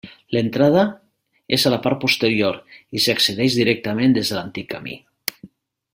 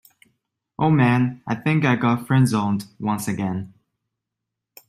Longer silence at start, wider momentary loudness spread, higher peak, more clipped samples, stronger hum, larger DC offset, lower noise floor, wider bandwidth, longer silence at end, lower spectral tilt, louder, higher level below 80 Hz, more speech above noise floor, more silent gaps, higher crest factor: second, 0.05 s vs 0.8 s; first, 13 LU vs 9 LU; first, 0 dBFS vs -4 dBFS; neither; neither; neither; second, -47 dBFS vs -83 dBFS; about the same, 16.5 kHz vs 15 kHz; second, 0.5 s vs 1.2 s; second, -4.5 dB/octave vs -7 dB/octave; about the same, -19 LUFS vs -21 LUFS; about the same, -56 dBFS vs -60 dBFS; second, 28 dB vs 63 dB; neither; about the same, 20 dB vs 18 dB